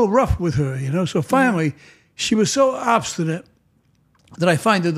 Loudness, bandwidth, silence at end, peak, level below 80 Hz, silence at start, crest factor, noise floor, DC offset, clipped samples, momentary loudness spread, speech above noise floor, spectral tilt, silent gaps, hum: -19 LUFS; 15 kHz; 0 s; -2 dBFS; -40 dBFS; 0 s; 18 dB; -60 dBFS; under 0.1%; under 0.1%; 8 LU; 42 dB; -5 dB/octave; none; none